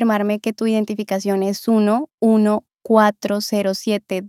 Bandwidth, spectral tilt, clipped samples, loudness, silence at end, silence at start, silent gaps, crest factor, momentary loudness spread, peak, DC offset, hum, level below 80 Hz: 15.5 kHz; -5.5 dB/octave; under 0.1%; -19 LUFS; 0 s; 0 s; 2.14-2.18 s; 18 dB; 7 LU; 0 dBFS; under 0.1%; none; -76 dBFS